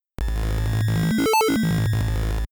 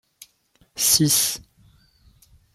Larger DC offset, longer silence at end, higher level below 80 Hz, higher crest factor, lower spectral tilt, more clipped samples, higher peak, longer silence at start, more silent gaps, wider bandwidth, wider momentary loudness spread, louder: neither; second, 0.05 s vs 1.15 s; first, -28 dBFS vs -56 dBFS; second, 8 dB vs 24 dB; first, -6 dB/octave vs -2 dB/octave; neither; second, -14 dBFS vs -2 dBFS; second, 0.2 s vs 0.75 s; neither; first, over 20 kHz vs 16.5 kHz; second, 7 LU vs 19 LU; second, -22 LUFS vs -18 LUFS